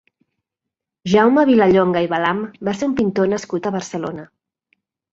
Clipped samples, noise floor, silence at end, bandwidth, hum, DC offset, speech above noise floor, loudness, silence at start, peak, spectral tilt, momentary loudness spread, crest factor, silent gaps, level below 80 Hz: under 0.1%; -83 dBFS; 0.85 s; 8 kHz; none; under 0.1%; 67 dB; -17 LUFS; 1.05 s; -2 dBFS; -6 dB/octave; 14 LU; 16 dB; none; -54 dBFS